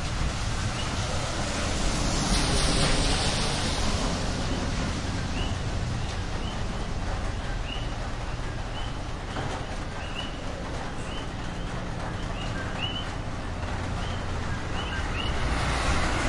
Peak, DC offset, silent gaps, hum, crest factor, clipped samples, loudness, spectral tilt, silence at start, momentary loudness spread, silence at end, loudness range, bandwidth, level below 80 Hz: -12 dBFS; under 0.1%; none; none; 18 dB; under 0.1%; -30 LUFS; -4 dB/octave; 0 s; 9 LU; 0 s; 8 LU; 11.5 kHz; -32 dBFS